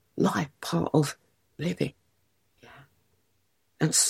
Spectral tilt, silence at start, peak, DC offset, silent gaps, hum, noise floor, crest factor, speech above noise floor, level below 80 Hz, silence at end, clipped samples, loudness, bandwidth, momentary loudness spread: -4 dB/octave; 0.15 s; -8 dBFS; under 0.1%; none; none; -74 dBFS; 22 dB; 48 dB; -66 dBFS; 0 s; under 0.1%; -29 LUFS; 16.5 kHz; 9 LU